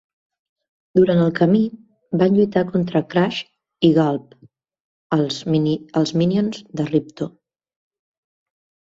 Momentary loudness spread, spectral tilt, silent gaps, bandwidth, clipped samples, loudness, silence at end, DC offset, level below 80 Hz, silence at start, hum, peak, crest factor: 11 LU; -7.5 dB/octave; 4.80-5.10 s; 7.8 kHz; under 0.1%; -19 LUFS; 1.55 s; under 0.1%; -58 dBFS; 0.95 s; none; -2 dBFS; 18 dB